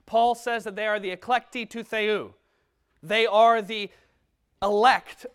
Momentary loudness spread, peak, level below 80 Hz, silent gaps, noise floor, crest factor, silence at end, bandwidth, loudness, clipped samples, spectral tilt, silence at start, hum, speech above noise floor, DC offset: 13 LU; -6 dBFS; -64 dBFS; none; -71 dBFS; 20 dB; 0.05 s; 14 kHz; -24 LUFS; under 0.1%; -3.5 dB/octave; 0.1 s; none; 47 dB; under 0.1%